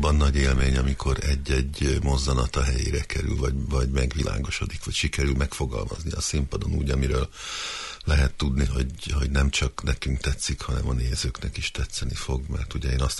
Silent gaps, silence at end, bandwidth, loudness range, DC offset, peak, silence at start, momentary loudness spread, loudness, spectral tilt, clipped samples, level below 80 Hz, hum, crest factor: none; 0 s; 11.5 kHz; 2 LU; under 0.1%; -10 dBFS; 0 s; 7 LU; -26 LUFS; -5 dB/octave; under 0.1%; -28 dBFS; none; 14 dB